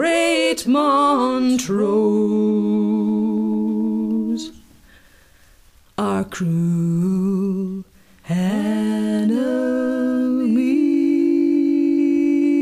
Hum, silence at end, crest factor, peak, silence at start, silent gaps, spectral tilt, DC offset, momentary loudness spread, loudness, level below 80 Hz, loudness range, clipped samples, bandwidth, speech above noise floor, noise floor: none; 0 s; 12 dB; -8 dBFS; 0 s; none; -6.5 dB/octave; 0.1%; 6 LU; -19 LUFS; -56 dBFS; 6 LU; under 0.1%; 14.5 kHz; 34 dB; -51 dBFS